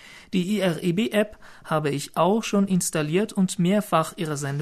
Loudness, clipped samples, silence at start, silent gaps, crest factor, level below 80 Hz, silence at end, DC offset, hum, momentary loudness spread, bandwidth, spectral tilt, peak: -24 LUFS; under 0.1%; 0.05 s; none; 16 dB; -58 dBFS; 0 s; under 0.1%; none; 6 LU; 13.5 kHz; -5.5 dB/octave; -6 dBFS